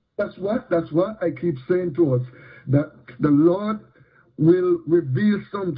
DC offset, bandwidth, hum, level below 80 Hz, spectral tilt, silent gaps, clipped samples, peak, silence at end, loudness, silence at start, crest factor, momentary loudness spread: under 0.1%; 4.9 kHz; none; -58 dBFS; -12.5 dB/octave; none; under 0.1%; -6 dBFS; 0 s; -21 LUFS; 0.2 s; 16 dB; 11 LU